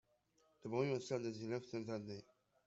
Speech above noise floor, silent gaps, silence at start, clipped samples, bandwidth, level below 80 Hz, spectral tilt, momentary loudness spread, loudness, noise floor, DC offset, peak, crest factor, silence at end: 35 dB; none; 0.65 s; under 0.1%; 8 kHz; -82 dBFS; -6 dB/octave; 13 LU; -44 LUFS; -78 dBFS; under 0.1%; -24 dBFS; 20 dB; 0.45 s